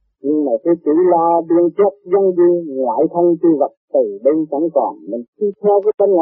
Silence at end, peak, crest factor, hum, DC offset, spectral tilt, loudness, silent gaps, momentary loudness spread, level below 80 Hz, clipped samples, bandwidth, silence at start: 0 s; -2 dBFS; 12 dB; none; under 0.1%; -10.5 dB/octave; -15 LUFS; 3.77-3.88 s, 5.28-5.33 s, 5.94-5.98 s; 6 LU; -66 dBFS; under 0.1%; 2.3 kHz; 0.25 s